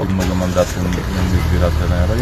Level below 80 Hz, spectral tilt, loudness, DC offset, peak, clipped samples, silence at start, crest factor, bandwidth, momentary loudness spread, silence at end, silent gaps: -22 dBFS; -6.5 dB/octave; -17 LUFS; under 0.1%; 0 dBFS; under 0.1%; 0 s; 14 dB; 13.5 kHz; 3 LU; 0 s; none